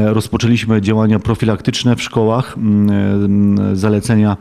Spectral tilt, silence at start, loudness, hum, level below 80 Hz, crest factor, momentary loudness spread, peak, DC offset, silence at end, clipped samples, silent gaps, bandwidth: -7 dB/octave; 0 s; -14 LUFS; none; -40 dBFS; 12 dB; 3 LU; -2 dBFS; under 0.1%; 0.05 s; under 0.1%; none; 13.5 kHz